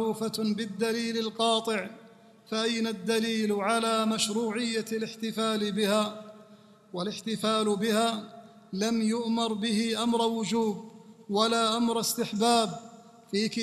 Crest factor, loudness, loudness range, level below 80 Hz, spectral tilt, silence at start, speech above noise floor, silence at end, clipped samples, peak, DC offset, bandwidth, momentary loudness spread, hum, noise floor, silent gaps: 20 dB; -28 LUFS; 3 LU; -72 dBFS; -4 dB/octave; 0 s; 27 dB; 0 s; under 0.1%; -10 dBFS; under 0.1%; 14.5 kHz; 8 LU; none; -55 dBFS; none